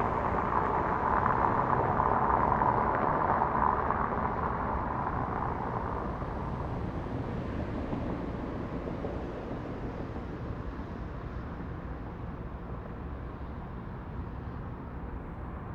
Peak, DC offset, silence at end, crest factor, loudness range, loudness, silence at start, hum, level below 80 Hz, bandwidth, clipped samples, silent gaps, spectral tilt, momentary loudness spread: -12 dBFS; under 0.1%; 0 s; 20 dB; 13 LU; -32 LUFS; 0 s; none; -42 dBFS; 7.2 kHz; under 0.1%; none; -9 dB/octave; 14 LU